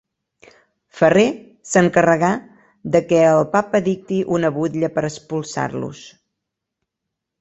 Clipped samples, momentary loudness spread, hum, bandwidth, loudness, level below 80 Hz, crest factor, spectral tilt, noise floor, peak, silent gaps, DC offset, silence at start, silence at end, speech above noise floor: under 0.1%; 13 LU; none; 8.2 kHz; -18 LUFS; -58 dBFS; 18 dB; -6 dB/octave; -81 dBFS; -2 dBFS; none; under 0.1%; 0.95 s; 1.3 s; 64 dB